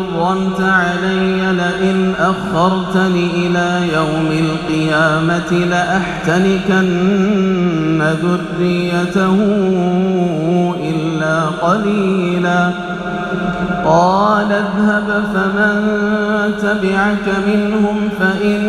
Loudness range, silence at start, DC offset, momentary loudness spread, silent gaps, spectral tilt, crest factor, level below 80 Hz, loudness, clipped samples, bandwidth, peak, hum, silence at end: 1 LU; 0 s; under 0.1%; 4 LU; none; -6.5 dB/octave; 14 dB; -42 dBFS; -15 LUFS; under 0.1%; 10.5 kHz; 0 dBFS; none; 0 s